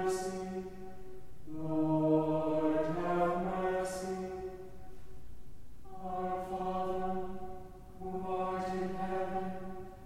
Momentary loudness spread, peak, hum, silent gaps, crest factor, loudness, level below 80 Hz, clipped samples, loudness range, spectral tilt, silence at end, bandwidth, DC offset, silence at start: 21 LU; -18 dBFS; none; none; 18 dB; -35 LUFS; -54 dBFS; under 0.1%; 7 LU; -7 dB/octave; 0 s; 16 kHz; under 0.1%; 0 s